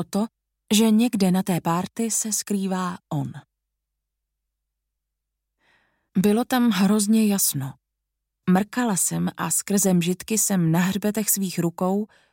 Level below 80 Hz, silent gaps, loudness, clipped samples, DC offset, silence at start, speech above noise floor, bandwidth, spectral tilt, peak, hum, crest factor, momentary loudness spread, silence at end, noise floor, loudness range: -66 dBFS; none; -22 LUFS; under 0.1%; under 0.1%; 0 s; 60 dB; 17 kHz; -4.5 dB/octave; -6 dBFS; none; 18 dB; 9 LU; 0.3 s; -82 dBFS; 10 LU